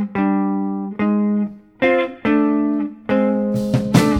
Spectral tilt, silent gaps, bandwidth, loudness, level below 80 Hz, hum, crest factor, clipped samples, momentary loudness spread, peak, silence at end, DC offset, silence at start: -7 dB/octave; none; 15.5 kHz; -19 LUFS; -48 dBFS; none; 18 dB; under 0.1%; 6 LU; 0 dBFS; 0 s; under 0.1%; 0 s